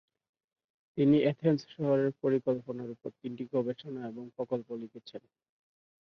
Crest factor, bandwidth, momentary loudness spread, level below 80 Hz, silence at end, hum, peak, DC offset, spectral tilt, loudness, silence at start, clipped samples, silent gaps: 18 dB; 6.4 kHz; 17 LU; -72 dBFS; 0.85 s; none; -14 dBFS; under 0.1%; -9 dB/octave; -31 LUFS; 0.95 s; under 0.1%; none